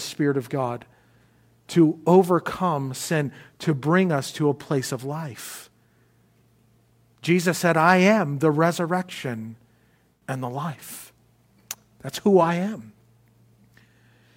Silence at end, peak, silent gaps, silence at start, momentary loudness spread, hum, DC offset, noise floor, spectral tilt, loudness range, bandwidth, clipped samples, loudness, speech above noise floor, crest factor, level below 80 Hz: 1.45 s; -4 dBFS; none; 0 s; 20 LU; none; under 0.1%; -62 dBFS; -6 dB/octave; 7 LU; 16.5 kHz; under 0.1%; -23 LUFS; 39 dB; 22 dB; -66 dBFS